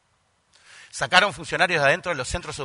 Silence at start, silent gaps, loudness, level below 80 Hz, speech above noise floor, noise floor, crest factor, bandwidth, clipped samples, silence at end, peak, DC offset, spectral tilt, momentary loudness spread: 0.75 s; none; -21 LUFS; -48 dBFS; 44 dB; -67 dBFS; 24 dB; 11 kHz; under 0.1%; 0 s; 0 dBFS; under 0.1%; -3 dB/octave; 11 LU